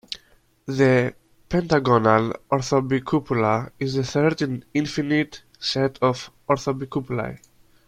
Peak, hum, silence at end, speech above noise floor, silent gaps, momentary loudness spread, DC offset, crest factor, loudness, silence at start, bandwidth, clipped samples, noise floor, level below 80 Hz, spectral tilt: -2 dBFS; none; 0.5 s; 37 dB; none; 11 LU; under 0.1%; 20 dB; -22 LUFS; 0.1 s; 12.5 kHz; under 0.1%; -58 dBFS; -52 dBFS; -6 dB/octave